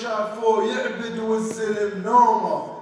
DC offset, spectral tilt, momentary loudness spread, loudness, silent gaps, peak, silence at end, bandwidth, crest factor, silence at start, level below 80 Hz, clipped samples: under 0.1%; -5 dB/octave; 10 LU; -22 LUFS; none; -6 dBFS; 0 s; 11 kHz; 16 dB; 0 s; -70 dBFS; under 0.1%